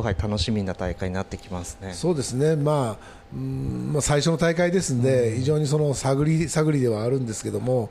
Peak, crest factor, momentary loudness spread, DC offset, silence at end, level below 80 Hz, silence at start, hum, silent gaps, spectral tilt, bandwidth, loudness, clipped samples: -10 dBFS; 12 dB; 11 LU; under 0.1%; 0 s; -42 dBFS; 0 s; none; none; -6 dB/octave; 14 kHz; -24 LUFS; under 0.1%